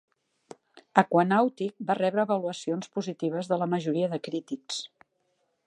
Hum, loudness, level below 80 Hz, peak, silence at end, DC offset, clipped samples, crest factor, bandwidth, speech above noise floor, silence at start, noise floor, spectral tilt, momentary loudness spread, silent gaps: none; -28 LUFS; -80 dBFS; -2 dBFS; 0.8 s; under 0.1%; under 0.1%; 26 dB; 11 kHz; 47 dB; 0.75 s; -74 dBFS; -6 dB/octave; 12 LU; none